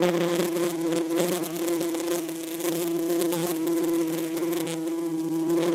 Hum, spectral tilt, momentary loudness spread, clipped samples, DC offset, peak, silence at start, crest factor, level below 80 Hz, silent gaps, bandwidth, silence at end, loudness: none; -4.5 dB/octave; 4 LU; under 0.1%; under 0.1%; -6 dBFS; 0 s; 20 dB; -70 dBFS; none; 16.5 kHz; 0 s; -27 LUFS